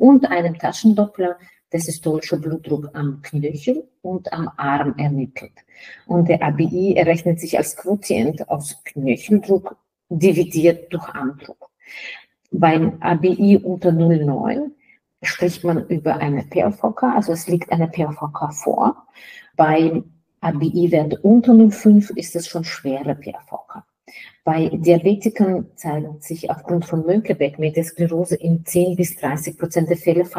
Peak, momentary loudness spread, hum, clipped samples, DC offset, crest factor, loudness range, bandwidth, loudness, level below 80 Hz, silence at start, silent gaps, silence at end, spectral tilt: -2 dBFS; 12 LU; none; under 0.1%; under 0.1%; 16 dB; 6 LU; 15.5 kHz; -19 LUFS; -58 dBFS; 0 s; none; 0 s; -7 dB/octave